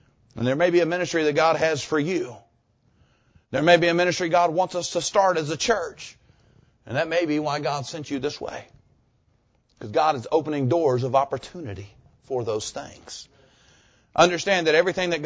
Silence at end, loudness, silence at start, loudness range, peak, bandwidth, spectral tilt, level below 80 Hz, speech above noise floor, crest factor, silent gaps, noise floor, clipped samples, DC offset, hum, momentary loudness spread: 0 s; -23 LUFS; 0.35 s; 7 LU; -2 dBFS; 8 kHz; -4.5 dB/octave; -58 dBFS; 42 dB; 22 dB; none; -65 dBFS; under 0.1%; under 0.1%; none; 17 LU